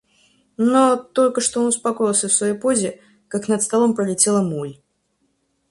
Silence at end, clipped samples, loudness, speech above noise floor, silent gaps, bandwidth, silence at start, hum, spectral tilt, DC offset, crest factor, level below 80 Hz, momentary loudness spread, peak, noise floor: 0.95 s; under 0.1%; -19 LUFS; 49 dB; none; 11.5 kHz; 0.6 s; none; -4 dB/octave; under 0.1%; 18 dB; -62 dBFS; 10 LU; -2 dBFS; -68 dBFS